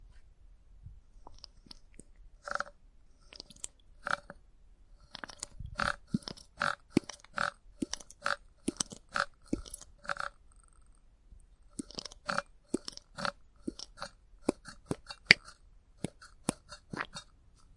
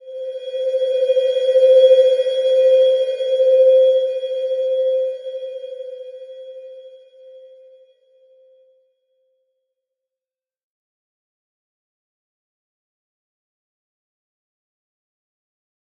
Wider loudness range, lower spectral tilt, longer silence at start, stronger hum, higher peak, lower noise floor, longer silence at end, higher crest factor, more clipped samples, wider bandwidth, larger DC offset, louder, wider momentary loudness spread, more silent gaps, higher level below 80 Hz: second, 11 LU vs 21 LU; first, -3 dB/octave vs 0 dB/octave; about the same, 0 s vs 0.05 s; neither; about the same, 0 dBFS vs -2 dBFS; second, -60 dBFS vs under -90 dBFS; second, 0.55 s vs 8.6 s; first, 40 dB vs 18 dB; neither; first, 11.5 kHz vs 7 kHz; neither; second, -36 LUFS vs -15 LUFS; second, 17 LU vs 22 LU; neither; first, -58 dBFS vs under -90 dBFS